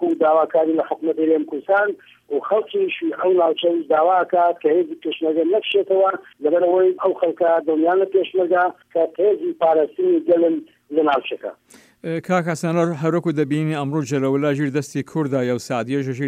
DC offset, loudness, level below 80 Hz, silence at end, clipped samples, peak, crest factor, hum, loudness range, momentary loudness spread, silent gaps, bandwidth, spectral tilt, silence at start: under 0.1%; -19 LUFS; -70 dBFS; 0 s; under 0.1%; -6 dBFS; 12 dB; none; 3 LU; 7 LU; none; 12 kHz; -6.5 dB/octave; 0 s